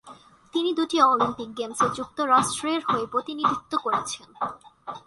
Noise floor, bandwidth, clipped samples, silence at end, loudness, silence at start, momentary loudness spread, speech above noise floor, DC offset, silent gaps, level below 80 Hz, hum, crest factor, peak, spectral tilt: -49 dBFS; 11.5 kHz; under 0.1%; 0.1 s; -25 LUFS; 0.05 s; 13 LU; 25 dB; under 0.1%; none; -62 dBFS; none; 20 dB; -6 dBFS; -3.5 dB/octave